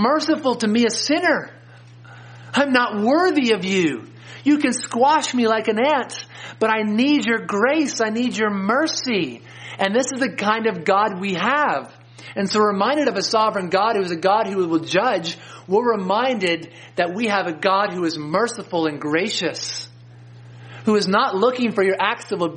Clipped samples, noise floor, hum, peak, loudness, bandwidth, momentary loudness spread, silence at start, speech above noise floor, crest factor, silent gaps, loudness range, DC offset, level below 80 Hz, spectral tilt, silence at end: under 0.1%; -43 dBFS; none; 0 dBFS; -20 LUFS; 10 kHz; 9 LU; 0 s; 24 dB; 20 dB; none; 3 LU; under 0.1%; -68 dBFS; -4 dB/octave; 0 s